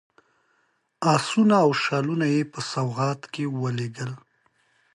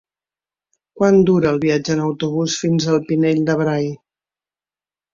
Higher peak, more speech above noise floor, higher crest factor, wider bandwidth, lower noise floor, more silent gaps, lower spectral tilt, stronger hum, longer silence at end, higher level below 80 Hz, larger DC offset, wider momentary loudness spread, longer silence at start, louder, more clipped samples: second, -6 dBFS vs -2 dBFS; second, 46 dB vs over 74 dB; about the same, 18 dB vs 16 dB; first, 11.5 kHz vs 7.6 kHz; second, -69 dBFS vs under -90 dBFS; neither; about the same, -6 dB/octave vs -6 dB/octave; neither; second, 0.8 s vs 1.2 s; second, -70 dBFS vs -54 dBFS; neither; first, 12 LU vs 7 LU; about the same, 1 s vs 0.95 s; second, -24 LUFS vs -17 LUFS; neither